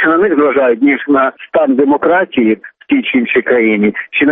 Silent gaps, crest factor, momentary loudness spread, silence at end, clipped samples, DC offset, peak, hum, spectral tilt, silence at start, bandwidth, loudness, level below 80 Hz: none; 10 dB; 4 LU; 0 s; under 0.1%; under 0.1%; -2 dBFS; none; -9 dB/octave; 0 s; 3.8 kHz; -12 LUFS; -54 dBFS